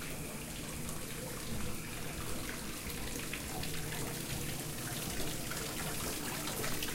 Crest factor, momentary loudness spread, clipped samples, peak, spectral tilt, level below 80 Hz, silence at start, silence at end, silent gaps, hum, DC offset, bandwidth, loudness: 18 dB; 4 LU; under 0.1%; -22 dBFS; -3 dB/octave; -50 dBFS; 0 s; 0 s; none; none; under 0.1%; 16.5 kHz; -39 LUFS